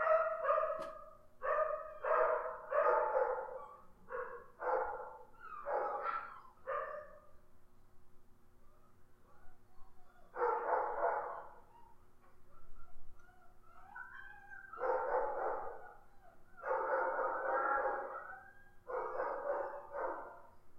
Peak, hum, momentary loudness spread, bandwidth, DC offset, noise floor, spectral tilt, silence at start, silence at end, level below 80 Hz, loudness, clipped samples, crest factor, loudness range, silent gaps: -20 dBFS; none; 19 LU; 6.8 kHz; under 0.1%; -59 dBFS; -6 dB/octave; 0 s; 0 s; -64 dBFS; -38 LUFS; under 0.1%; 20 dB; 13 LU; none